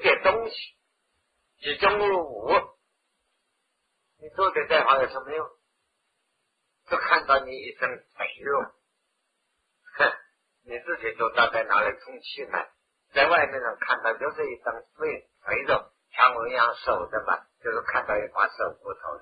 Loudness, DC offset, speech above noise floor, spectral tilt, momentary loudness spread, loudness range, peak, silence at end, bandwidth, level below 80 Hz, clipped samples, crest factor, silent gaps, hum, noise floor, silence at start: -25 LUFS; under 0.1%; 51 dB; -5.5 dB/octave; 16 LU; 3 LU; -4 dBFS; 0.05 s; 5 kHz; -60 dBFS; under 0.1%; 22 dB; none; none; -76 dBFS; 0 s